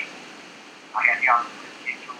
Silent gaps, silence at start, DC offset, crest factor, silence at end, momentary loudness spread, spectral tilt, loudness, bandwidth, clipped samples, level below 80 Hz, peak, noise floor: none; 0 s; under 0.1%; 24 dB; 0 s; 23 LU; -1.5 dB/octave; -22 LUFS; 12.5 kHz; under 0.1%; under -90 dBFS; -2 dBFS; -44 dBFS